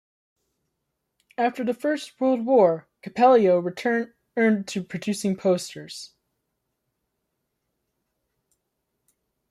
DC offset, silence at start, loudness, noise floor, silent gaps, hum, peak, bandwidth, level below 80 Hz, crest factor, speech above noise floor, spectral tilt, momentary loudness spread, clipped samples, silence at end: under 0.1%; 1.4 s; -23 LUFS; -79 dBFS; none; none; -6 dBFS; 13.5 kHz; -74 dBFS; 18 dB; 57 dB; -5.5 dB/octave; 17 LU; under 0.1%; 3.45 s